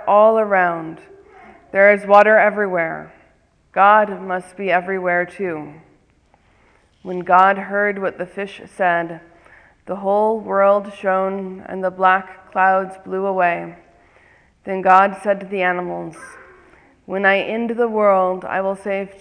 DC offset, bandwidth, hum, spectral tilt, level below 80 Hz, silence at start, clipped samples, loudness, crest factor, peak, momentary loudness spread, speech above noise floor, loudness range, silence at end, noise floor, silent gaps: under 0.1%; 10 kHz; none; -6.5 dB/octave; -60 dBFS; 0 s; under 0.1%; -17 LUFS; 18 dB; 0 dBFS; 17 LU; 39 dB; 5 LU; 0.15 s; -57 dBFS; none